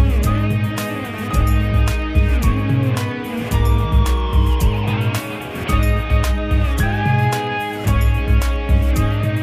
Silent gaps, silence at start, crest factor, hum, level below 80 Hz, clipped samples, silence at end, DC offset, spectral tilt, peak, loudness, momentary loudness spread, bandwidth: none; 0 s; 12 dB; none; -18 dBFS; under 0.1%; 0 s; under 0.1%; -6.5 dB/octave; -4 dBFS; -18 LUFS; 5 LU; 15.5 kHz